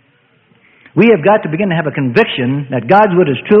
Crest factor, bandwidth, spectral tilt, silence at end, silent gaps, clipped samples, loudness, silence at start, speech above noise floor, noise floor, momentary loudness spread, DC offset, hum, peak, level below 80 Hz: 12 dB; 5.8 kHz; -9 dB/octave; 0 s; none; under 0.1%; -12 LUFS; 0.95 s; 42 dB; -53 dBFS; 8 LU; under 0.1%; none; 0 dBFS; -54 dBFS